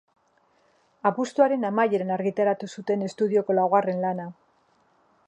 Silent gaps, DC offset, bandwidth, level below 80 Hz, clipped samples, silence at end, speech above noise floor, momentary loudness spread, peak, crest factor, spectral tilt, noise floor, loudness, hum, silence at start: none; under 0.1%; 9.8 kHz; -76 dBFS; under 0.1%; 0.95 s; 41 dB; 7 LU; -6 dBFS; 20 dB; -7 dB/octave; -65 dBFS; -24 LUFS; none; 1.05 s